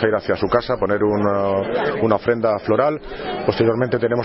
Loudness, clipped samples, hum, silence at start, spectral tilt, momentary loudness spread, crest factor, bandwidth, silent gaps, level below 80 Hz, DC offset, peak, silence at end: -19 LUFS; under 0.1%; none; 0 s; -11 dB/octave; 4 LU; 16 dB; 5.8 kHz; none; -46 dBFS; under 0.1%; -2 dBFS; 0 s